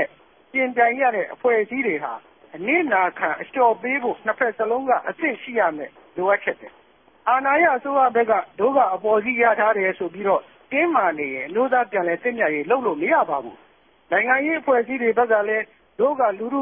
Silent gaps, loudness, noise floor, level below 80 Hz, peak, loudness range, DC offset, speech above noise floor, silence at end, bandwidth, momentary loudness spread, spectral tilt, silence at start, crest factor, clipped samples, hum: none; -21 LUFS; -41 dBFS; -68 dBFS; -4 dBFS; 3 LU; under 0.1%; 20 dB; 0 s; 3.6 kHz; 8 LU; -9.5 dB/octave; 0 s; 16 dB; under 0.1%; none